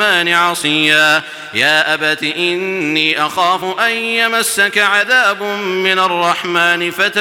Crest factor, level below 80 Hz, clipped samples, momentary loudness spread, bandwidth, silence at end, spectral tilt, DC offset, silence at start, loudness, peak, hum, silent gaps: 14 dB; -62 dBFS; under 0.1%; 5 LU; 17 kHz; 0 s; -2 dB/octave; under 0.1%; 0 s; -13 LUFS; 0 dBFS; none; none